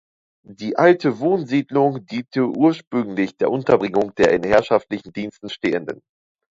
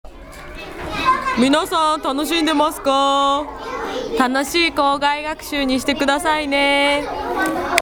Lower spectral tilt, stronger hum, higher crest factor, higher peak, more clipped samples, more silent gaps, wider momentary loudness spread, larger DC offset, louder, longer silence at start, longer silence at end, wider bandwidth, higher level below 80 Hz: first, -7 dB/octave vs -3 dB/octave; neither; about the same, 20 dB vs 18 dB; about the same, 0 dBFS vs 0 dBFS; neither; first, 2.87-2.91 s vs none; first, 14 LU vs 11 LU; neither; about the same, -19 LUFS vs -18 LUFS; first, 0.5 s vs 0.05 s; first, 0.6 s vs 0 s; second, 7.8 kHz vs over 20 kHz; second, -54 dBFS vs -42 dBFS